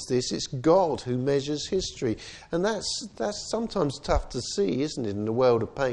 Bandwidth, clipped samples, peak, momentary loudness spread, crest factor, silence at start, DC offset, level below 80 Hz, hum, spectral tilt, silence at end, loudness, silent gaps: 10.5 kHz; under 0.1%; -8 dBFS; 8 LU; 18 dB; 0 s; under 0.1%; -42 dBFS; none; -5 dB/octave; 0 s; -27 LUFS; none